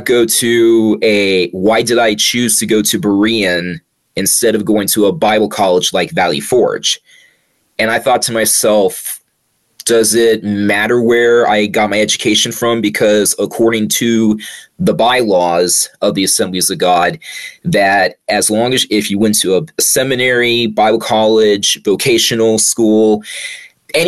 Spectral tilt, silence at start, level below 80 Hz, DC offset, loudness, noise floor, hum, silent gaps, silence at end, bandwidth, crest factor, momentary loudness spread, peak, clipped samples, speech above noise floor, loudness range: -3 dB/octave; 0 s; -52 dBFS; under 0.1%; -12 LUFS; -62 dBFS; none; none; 0 s; 13 kHz; 10 dB; 7 LU; -2 dBFS; under 0.1%; 50 dB; 2 LU